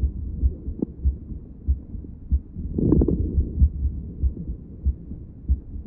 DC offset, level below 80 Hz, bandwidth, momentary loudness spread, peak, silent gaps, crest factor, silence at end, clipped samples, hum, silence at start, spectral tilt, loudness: under 0.1%; -26 dBFS; 1.2 kHz; 15 LU; -4 dBFS; none; 20 dB; 0 s; under 0.1%; none; 0 s; -16 dB/octave; -26 LUFS